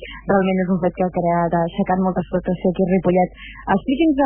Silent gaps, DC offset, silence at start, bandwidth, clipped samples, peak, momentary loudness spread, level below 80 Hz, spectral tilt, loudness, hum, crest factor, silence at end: none; under 0.1%; 0 s; 3.4 kHz; under 0.1%; -4 dBFS; 5 LU; -42 dBFS; -12 dB/octave; -19 LUFS; none; 14 dB; 0 s